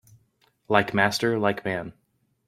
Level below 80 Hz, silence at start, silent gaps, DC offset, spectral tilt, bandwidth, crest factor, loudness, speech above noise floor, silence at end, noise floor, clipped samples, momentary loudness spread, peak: -62 dBFS; 0.7 s; none; under 0.1%; -5 dB/octave; 15.5 kHz; 24 dB; -24 LUFS; 43 dB; 0.55 s; -66 dBFS; under 0.1%; 10 LU; -4 dBFS